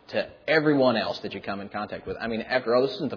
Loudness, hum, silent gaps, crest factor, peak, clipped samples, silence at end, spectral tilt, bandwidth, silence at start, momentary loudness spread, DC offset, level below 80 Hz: -26 LUFS; none; none; 18 dB; -8 dBFS; under 0.1%; 0 s; -7 dB/octave; 5.4 kHz; 0.1 s; 12 LU; under 0.1%; -60 dBFS